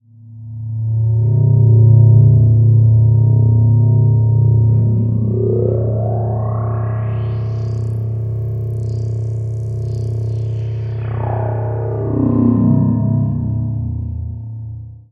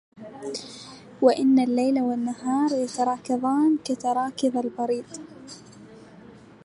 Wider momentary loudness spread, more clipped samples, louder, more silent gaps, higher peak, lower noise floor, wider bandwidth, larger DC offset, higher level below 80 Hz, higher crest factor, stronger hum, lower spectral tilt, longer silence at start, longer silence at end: second, 12 LU vs 21 LU; neither; first, -15 LUFS vs -24 LUFS; neither; first, 0 dBFS vs -6 dBFS; second, -35 dBFS vs -48 dBFS; second, 2 kHz vs 11.5 kHz; neither; first, -36 dBFS vs -70 dBFS; second, 14 dB vs 20 dB; neither; first, -12 dB/octave vs -5 dB/octave; about the same, 0.25 s vs 0.15 s; second, 0.15 s vs 0.35 s